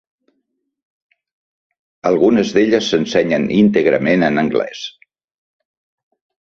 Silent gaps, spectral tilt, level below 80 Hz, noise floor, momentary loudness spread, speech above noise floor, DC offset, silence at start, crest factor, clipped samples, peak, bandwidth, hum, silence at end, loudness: none; -6 dB/octave; -54 dBFS; -71 dBFS; 9 LU; 57 dB; under 0.1%; 2.05 s; 16 dB; under 0.1%; -2 dBFS; 7.4 kHz; none; 1.6 s; -15 LUFS